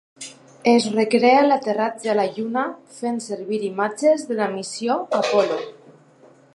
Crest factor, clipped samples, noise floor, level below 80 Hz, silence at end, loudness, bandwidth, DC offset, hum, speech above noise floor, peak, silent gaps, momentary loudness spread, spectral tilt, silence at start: 20 dB; under 0.1%; -51 dBFS; -74 dBFS; 0.85 s; -21 LUFS; 11.5 kHz; under 0.1%; none; 31 dB; -2 dBFS; none; 13 LU; -4.5 dB/octave; 0.2 s